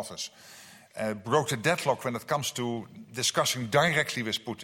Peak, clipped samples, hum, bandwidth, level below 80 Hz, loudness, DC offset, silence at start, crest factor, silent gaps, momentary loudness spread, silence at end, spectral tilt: -10 dBFS; under 0.1%; none; 16.5 kHz; -66 dBFS; -28 LUFS; under 0.1%; 0 s; 20 dB; none; 15 LU; 0 s; -3.5 dB/octave